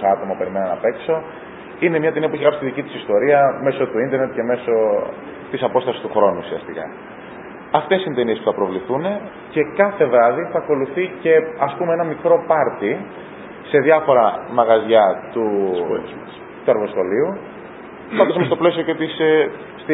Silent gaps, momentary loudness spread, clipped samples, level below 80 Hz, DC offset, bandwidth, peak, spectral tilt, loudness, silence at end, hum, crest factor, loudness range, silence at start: none; 18 LU; under 0.1%; -58 dBFS; under 0.1%; 4 kHz; 0 dBFS; -10.5 dB/octave; -18 LUFS; 0 s; none; 18 dB; 4 LU; 0 s